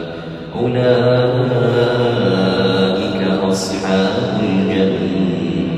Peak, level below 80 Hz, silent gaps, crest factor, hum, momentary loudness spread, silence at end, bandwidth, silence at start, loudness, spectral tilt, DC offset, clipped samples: -2 dBFS; -46 dBFS; none; 14 dB; none; 5 LU; 0 s; 12 kHz; 0 s; -16 LUFS; -6.5 dB/octave; under 0.1%; under 0.1%